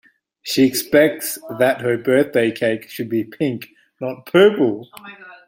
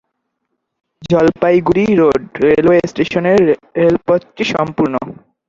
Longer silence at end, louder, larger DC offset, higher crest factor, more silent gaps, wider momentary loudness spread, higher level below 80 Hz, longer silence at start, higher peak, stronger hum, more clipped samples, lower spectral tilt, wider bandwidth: second, 0.15 s vs 0.35 s; second, -18 LUFS vs -13 LUFS; neither; about the same, 16 dB vs 14 dB; neither; first, 17 LU vs 6 LU; second, -62 dBFS vs -46 dBFS; second, 0.45 s vs 1 s; about the same, -2 dBFS vs 0 dBFS; neither; neither; second, -4.5 dB/octave vs -7 dB/octave; first, 17 kHz vs 7.6 kHz